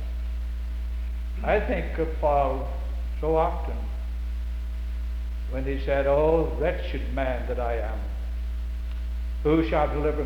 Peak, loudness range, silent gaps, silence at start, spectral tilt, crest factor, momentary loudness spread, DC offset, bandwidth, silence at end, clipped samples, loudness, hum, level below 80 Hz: -10 dBFS; 3 LU; none; 0 s; -8 dB/octave; 16 dB; 10 LU; under 0.1%; 5.6 kHz; 0 s; under 0.1%; -28 LUFS; none; -30 dBFS